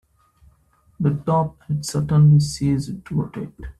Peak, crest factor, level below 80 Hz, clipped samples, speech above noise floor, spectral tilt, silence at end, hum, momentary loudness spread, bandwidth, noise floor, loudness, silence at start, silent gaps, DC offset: -6 dBFS; 14 dB; -46 dBFS; under 0.1%; 39 dB; -7.5 dB/octave; 0.1 s; none; 12 LU; 12.5 kHz; -59 dBFS; -20 LUFS; 1 s; none; under 0.1%